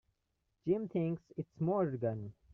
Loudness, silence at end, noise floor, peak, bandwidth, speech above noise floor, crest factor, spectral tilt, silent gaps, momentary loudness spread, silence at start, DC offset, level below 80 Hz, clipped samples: -37 LUFS; 0.2 s; -83 dBFS; -20 dBFS; 3.5 kHz; 47 dB; 16 dB; -10 dB/octave; none; 10 LU; 0.65 s; under 0.1%; -72 dBFS; under 0.1%